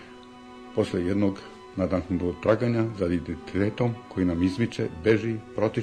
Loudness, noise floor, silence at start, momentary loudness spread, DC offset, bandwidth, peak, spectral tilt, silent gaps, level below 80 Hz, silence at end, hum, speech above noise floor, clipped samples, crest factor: -27 LUFS; -46 dBFS; 0 s; 12 LU; under 0.1%; 10 kHz; -10 dBFS; -8 dB/octave; none; -50 dBFS; 0 s; none; 20 dB; under 0.1%; 16 dB